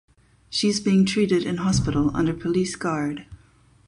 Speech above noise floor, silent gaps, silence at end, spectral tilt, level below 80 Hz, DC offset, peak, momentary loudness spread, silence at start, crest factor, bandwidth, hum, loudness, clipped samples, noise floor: 34 dB; none; 0.55 s; -5.5 dB/octave; -44 dBFS; under 0.1%; -10 dBFS; 8 LU; 0.5 s; 14 dB; 11 kHz; none; -23 LUFS; under 0.1%; -56 dBFS